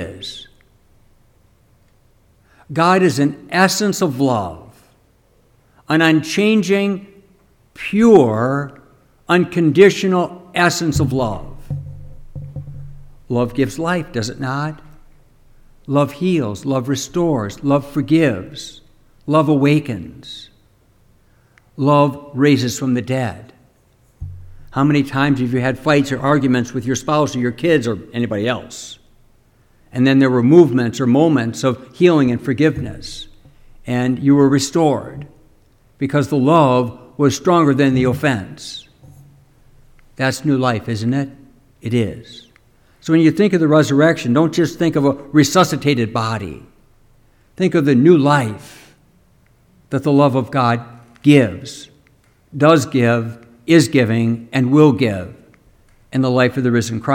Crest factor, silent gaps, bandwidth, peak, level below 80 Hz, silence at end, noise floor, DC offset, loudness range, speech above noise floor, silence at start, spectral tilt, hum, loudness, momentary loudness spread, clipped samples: 16 dB; none; 17 kHz; 0 dBFS; -46 dBFS; 0 s; -55 dBFS; under 0.1%; 6 LU; 40 dB; 0 s; -6 dB/octave; none; -16 LUFS; 19 LU; under 0.1%